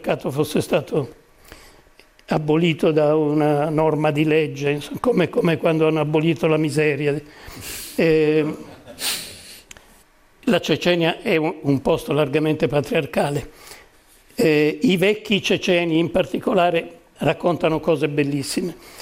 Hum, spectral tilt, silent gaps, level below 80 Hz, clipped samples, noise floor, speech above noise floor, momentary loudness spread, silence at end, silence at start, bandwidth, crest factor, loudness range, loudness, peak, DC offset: none; -5.5 dB/octave; none; -50 dBFS; under 0.1%; -53 dBFS; 34 dB; 10 LU; 0 s; 0 s; 16 kHz; 16 dB; 3 LU; -20 LUFS; -6 dBFS; under 0.1%